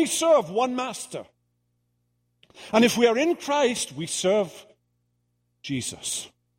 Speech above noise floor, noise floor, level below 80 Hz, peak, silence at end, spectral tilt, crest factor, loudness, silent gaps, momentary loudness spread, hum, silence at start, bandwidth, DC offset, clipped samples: 49 dB; -73 dBFS; -68 dBFS; -6 dBFS; 0.3 s; -3.5 dB/octave; 18 dB; -24 LUFS; none; 13 LU; 60 Hz at -50 dBFS; 0 s; 16 kHz; under 0.1%; under 0.1%